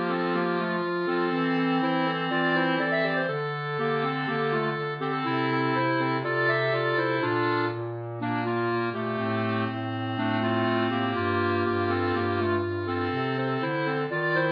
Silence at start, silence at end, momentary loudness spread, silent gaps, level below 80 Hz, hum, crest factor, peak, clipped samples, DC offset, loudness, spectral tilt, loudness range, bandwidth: 0 s; 0 s; 5 LU; none; -70 dBFS; none; 14 dB; -12 dBFS; under 0.1%; under 0.1%; -26 LUFS; -8.5 dB/octave; 2 LU; 5.2 kHz